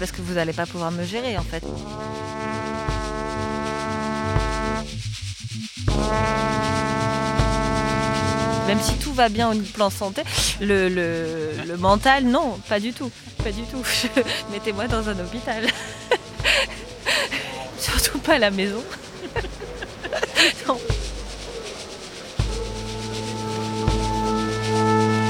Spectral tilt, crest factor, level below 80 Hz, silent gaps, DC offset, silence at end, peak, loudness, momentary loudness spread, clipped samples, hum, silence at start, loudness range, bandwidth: -4 dB/octave; 22 dB; -34 dBFS; none; under 0.1%; 0 s; -2 dBFS; -23 LUFS; 13 LU; under 0.1%; none; 0 s; 6 LU; 18 kHz